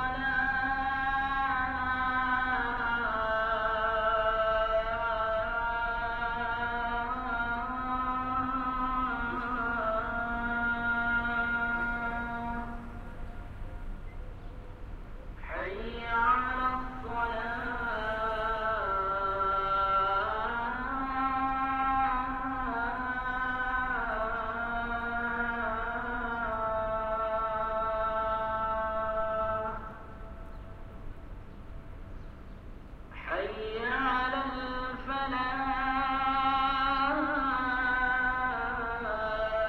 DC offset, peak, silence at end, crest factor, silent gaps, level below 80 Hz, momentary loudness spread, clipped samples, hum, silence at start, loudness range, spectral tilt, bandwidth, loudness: under 0.1%; -16 dBFS; 0 s; 16 dB; none; -44 dBFS; 19 LU; under 0.1%; none; 0 s; 8 LU; -6.5 dB/octave; 7.6 kHz; -31 LUFS